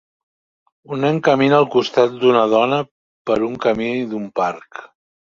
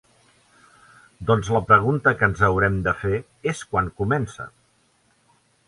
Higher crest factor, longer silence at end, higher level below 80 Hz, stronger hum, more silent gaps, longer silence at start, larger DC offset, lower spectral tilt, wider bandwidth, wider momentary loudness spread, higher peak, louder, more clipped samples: about the same, 18 dB vs 20 dB; second, 0.45 s vs 1.2 s; second, -58 dBFS vs -44 dBFS; neither; first, 2.91-3.25 s vs none; second, 0.9 s vs 1.2 s; neither; about the same, -6.5 dB/octave vs -6.5 dB/octave; second, 7.4 kHz vs 11.5 kHz; first, 17 LU vs 13 LU; about the same, -2 dBFS vs -2 dBFS; first, -17 LUFS vs -21 LUFS; neither